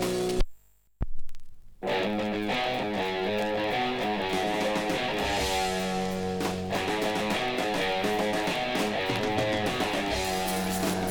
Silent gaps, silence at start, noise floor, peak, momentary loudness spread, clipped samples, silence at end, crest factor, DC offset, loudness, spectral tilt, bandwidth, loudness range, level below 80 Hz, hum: none; 0 s; -51 dBFS; -12 dBFS; 4 LU; under 0.1%; 0 s; 16 dB; under 0.1%; -28 LUFS; -4 dB/octave; 19.5 kHz; 3 LU; -42 dBFS; none